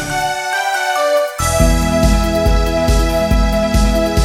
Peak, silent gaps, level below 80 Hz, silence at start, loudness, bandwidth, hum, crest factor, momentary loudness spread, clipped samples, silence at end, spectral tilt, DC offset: 0 dBFS; none; -18 dBFS; 0 s; -15 LUFS; 16.5 kHz; none; 14 dB; 3 LU; under 0.1%; 0 s; -5 dB/octave; under 0.1%